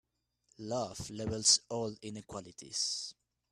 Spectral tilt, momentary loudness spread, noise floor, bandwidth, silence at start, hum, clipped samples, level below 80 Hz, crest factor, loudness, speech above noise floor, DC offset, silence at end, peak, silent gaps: -2 dB/octave; 19 LU; -75 dBFS; 14 kHz; 0.6 s; none; under 0.1%; -66 dBFS; 24 dB; -32 LUFS; 39 dB; under 0.1%; 0.4 s; -12 dBFS; none